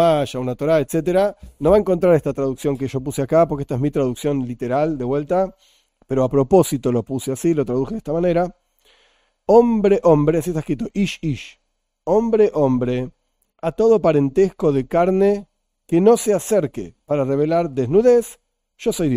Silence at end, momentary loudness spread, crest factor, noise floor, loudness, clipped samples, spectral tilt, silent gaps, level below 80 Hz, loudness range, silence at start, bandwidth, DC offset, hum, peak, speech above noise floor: 0 s; 10 LU; 18 dB; -60 dBFS; -19 LUFS; under 0.1%; -7 dB/octave; none; -44 dBFS; 3 LU; 0 s; 15.5 kHz; under 0.1%; none; -2 dBFS; 43 dB